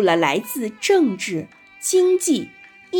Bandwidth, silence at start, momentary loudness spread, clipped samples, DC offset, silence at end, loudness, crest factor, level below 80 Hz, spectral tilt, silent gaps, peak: 17.5 kHz; 0 s; 12 LU; under 0.1%; under 0.1%; 0 s; -20 LUFS; 16 dB; -70 dBFS; -3.5 dB/octave; none; -4 dBFS